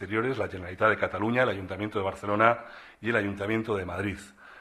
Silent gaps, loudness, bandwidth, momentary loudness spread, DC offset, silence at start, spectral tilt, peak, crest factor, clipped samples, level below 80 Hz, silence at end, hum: none; -28 LUFS; 13.5 kHz; 11 LU; under 0.1%; 0 s; -6.5 dB/octave; -8 dBFS; 22 dB; under 0.1%; -58 dBFS; 0 s; none